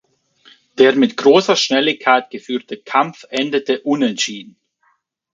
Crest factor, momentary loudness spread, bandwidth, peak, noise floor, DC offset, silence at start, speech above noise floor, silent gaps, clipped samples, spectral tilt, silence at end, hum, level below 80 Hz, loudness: 18 dB; 12 LU; 7.6 kHz; 0 dBFS; -63 dBFS; under 0.1%; 0.75 s; 47 dB; none; under 0.1%; -3.5 dB/octave; 0.9 s; none; -66 dBFS; -16 LUFS